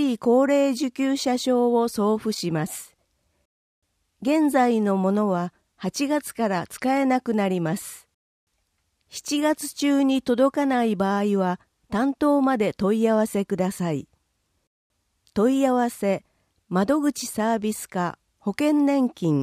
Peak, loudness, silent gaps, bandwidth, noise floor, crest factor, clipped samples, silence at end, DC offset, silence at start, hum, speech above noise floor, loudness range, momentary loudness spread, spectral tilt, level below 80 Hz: -8 dBFS; -23 LUFS; 3.45-3.82 s, 8.14-8.47 s, 14.67-14.90 s; 15.5 kHz; -73 dBFS; 16 dB; under 0.1%; 0 s; under 0.1%; 0 s; none; 50 dB; 4 LU; 10 LU; -5.5 dB/octave; -62 dBFS